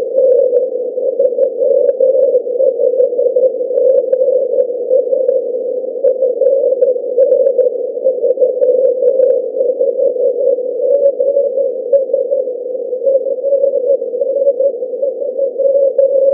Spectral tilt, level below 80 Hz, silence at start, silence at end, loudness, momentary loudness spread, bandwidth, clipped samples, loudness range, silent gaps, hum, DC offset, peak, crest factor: -11 dB/octave; -88 dBFS; 0 s; 0 s; -13 LUFS; 6 LU; 1.6 kHz; under 0.1%; 2 LU; none; none; under 0.1%; 0 dBFS; 12 dB